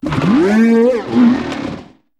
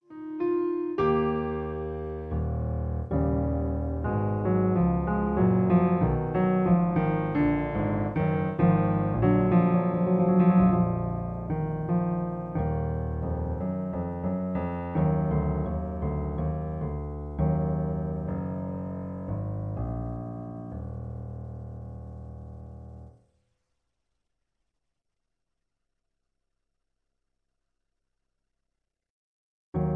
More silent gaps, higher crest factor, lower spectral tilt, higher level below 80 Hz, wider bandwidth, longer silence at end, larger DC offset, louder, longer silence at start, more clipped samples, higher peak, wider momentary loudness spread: second, none vs 29.10-29.73 s; second, 12 dB vs 18 dB; second, -7.5 dB/octave vs -12 dB/octave; about the same, -44 dBFS vs -40 dBFS; first, 9.4 kHz vs 3.7 kHz; first, 0.35 s vs 0 s; neither; first, -13 LUFS vs -27 LUFS; about the same, 0.05 s vs 0.1 s; neither; first, 0 dBFS vs -10 dBFS; about the same, 14 LU vs 15 LU